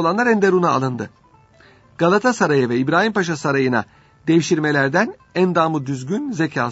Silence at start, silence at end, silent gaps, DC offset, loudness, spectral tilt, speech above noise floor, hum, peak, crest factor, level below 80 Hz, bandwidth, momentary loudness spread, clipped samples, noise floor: 0 s; 0 s; none; under 0.1%; -18 LUFS; -6 dB/octave; 32 dB; none; -2 dBFS; 18 dB; -60 dBFS; 8 kHz; 8 LU; under 0.1%; -50 dBFS